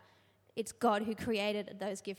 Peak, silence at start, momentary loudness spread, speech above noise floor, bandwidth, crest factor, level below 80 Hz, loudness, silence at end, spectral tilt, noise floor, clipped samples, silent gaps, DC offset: -18 dBFS; 0.55 s; 10 LU; 32 dB; 16.5 kHz; 20 dB; -70 dBFS; -35 LUFS; 0.05 s; -4.5 dB/octave; -67 dBFS; under 0.1%; none; under 0.1%